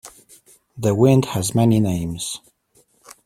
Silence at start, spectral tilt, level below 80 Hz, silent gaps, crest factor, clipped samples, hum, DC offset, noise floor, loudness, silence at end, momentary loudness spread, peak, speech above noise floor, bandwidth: 0.05 s; -6.5 dB/octave; -50 dBFS; none; 18 dB; under 0.1%; none; under 0.1%; -60 dBFS; -19 LUFS; 0.15 s; 12 LU; -2 dBFS; 42 dB; 16 kHz